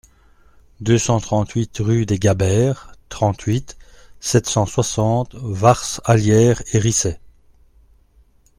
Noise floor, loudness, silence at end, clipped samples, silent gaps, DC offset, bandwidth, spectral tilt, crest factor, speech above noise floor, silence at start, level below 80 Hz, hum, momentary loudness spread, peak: -54 dBFS; -18 LUFS; 1.4 s; under 0.1%; none; under 0.1%; 15 kHz; -5.5 dB/octave; 18 dB; 36 dB; 0.8 s; -42 dBFS; none; 9 LU; 0 dBFS